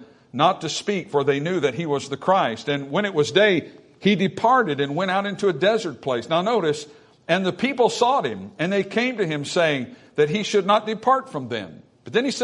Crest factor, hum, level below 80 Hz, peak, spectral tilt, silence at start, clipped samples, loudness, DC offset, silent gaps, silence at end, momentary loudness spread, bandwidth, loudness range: 18 dB; none; -68 dBFS; -4 dBFS; -5 dB/octave; 0 s; under 0.1%; -22 LUFS; under 0.1%; none; 0 s; 9 LU; 11 kHz; 2 LU